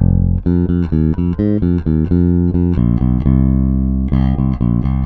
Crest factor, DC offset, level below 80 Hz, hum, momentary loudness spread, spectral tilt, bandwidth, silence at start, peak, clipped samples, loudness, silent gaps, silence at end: 12 dB; under 0.1%; -20 dBFS; none; 3 LU; -12.5 dB/octave; 4.4 kHz; 0 s; -2 dBFS; under 0.1%; -15 LUFS; none; 0 s